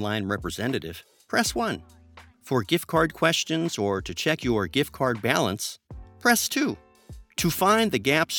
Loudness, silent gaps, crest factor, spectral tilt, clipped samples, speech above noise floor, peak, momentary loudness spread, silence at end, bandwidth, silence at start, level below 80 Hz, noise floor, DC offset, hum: -25 LUFS; none; 22 dB; -4 dB/octave; under 0.1%; 22 dB; -4 dBFS; 11 LU; 0 s; 19 kHz; 0 s; -50 dBFS; -47 dBFS; under 0.1%; none